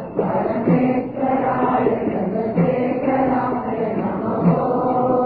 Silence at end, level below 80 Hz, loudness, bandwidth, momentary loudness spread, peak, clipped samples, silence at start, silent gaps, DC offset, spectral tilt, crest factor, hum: 0 s; -50 dBFS; -20 LUFS; 4.8 kHz; 5 LU; -4 dBFS; under 0.1%; 0 s; none; under 0.1%; -12.5 dB/octave; 14 dB; none